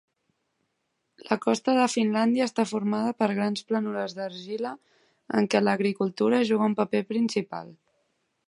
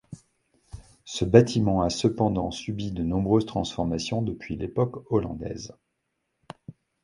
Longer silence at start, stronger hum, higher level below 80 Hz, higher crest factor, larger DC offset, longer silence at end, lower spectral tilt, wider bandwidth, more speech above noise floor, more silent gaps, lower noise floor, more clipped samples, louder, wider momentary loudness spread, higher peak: first, 1.25 s vs 0.1 s; neither; second, -76 dBFS vs -46 dBFS; second, 20 dB vs 26 dB; neither; first, 0.75 s vs 0.35 s; about the same, -5.5 dB/octave vs -6.5 dB/octave; about the same, 11.5 kHz vs 11.5 kHz; about the same, 52 dB vs 53 dB; neither; about the same, -77 dBFS vs -78 dBFS; neither; about the same, -26 LUFS vs -26 LUFS; second, 10 LU vs 19 LU; second, -6 dBFS vs -2 dBFS